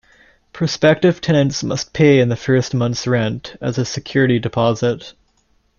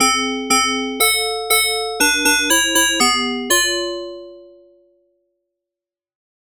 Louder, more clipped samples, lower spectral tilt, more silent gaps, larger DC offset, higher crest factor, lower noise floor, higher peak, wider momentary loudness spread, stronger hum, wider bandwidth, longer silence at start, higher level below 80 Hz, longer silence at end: about the same, -17 LUFS vs -15 LUFS; neither; first, -6 dB/octave vs 0.5 dB/octave; neither; neither; about the same, 16 dB vs 14 dB; second, -60 dBFS vs -88 dBFS; first, -2 dBFS vs -6 dBFS; about the same, 9 LU vs 9 LU; neither; second, 7.4 kHz vs 18 kHz; first, 0.55 s vs 0 s; about the same, -50 dBFS vs -48 dBFS; second, 0.7 s vs 2 s